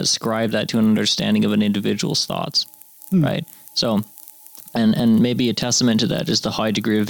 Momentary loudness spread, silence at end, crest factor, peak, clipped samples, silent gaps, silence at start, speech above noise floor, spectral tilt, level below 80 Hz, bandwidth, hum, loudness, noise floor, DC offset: 10 LU; 0 s; 12 dB; -8 dBFS; under 0.1%; none; 0 s; 23 dB; -4.5 dB/octave; -54 dBFS; over 20 kHz; none; -19 LUFS; -42 dBFS; under 0.1%